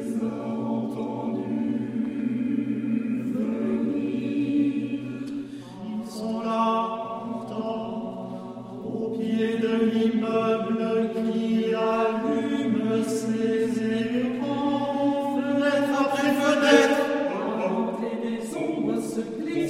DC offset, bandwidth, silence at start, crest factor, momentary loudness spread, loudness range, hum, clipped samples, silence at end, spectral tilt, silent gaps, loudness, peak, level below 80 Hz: under 0.1%; 15 kHz; 0 s; 20 dB; 10 LU; 7 LU; none; under 0.1%; 0 s; -5.5 dB/octave; none; -26 LUFS; -4 dBFS; -68 dBFS